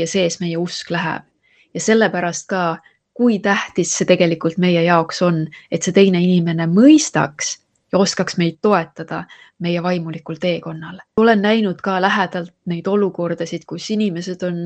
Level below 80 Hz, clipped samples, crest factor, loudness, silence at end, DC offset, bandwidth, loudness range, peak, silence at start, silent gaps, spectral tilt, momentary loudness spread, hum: -60 dBFS; under 0.1%; 18 dB; -17 LUFS; 0 s; under 0.1%; 9 kHz; 5 LU; 0 dBFS; 0 s; none; -5 dB/octave; 13 LU; none